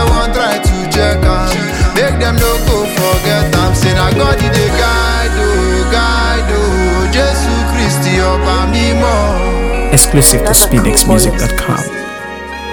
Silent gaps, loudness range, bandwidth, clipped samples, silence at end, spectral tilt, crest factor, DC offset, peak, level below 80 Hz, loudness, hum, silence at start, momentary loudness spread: none; 3 LU; over 20 kHz; 0.4%; 0 s; -4 dB/octave; 10 dB; under 0.1%; 0 dBFS; -16 dBFS; -11 LUFS; none; 0 s; 7 LU